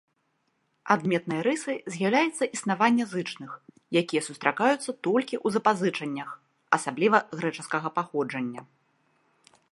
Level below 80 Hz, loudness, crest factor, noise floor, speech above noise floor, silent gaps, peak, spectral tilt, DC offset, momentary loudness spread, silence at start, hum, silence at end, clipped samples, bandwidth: -78 dBFS; -27 LUFS; 24 dB; -74 dBFS; 47 dB; none; -4 dBFS; -4.5 dB/octave; under 0.1%; 13 LU; 0.85 s; none; 1.1 s; under 0.1%; 11.5 kHz